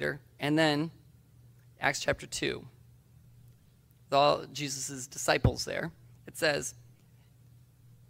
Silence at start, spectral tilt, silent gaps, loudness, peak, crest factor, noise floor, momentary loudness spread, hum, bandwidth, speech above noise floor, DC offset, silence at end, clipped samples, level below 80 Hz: 0 s; -4 dB/octave; none; -31 LUFS; -10 dBFS; 24 dB; -61 dBFS; 11 LU; none; 16 kHz; 31 dB; under 0.1%; 1.3 s; under 0.1%; -50 dBFS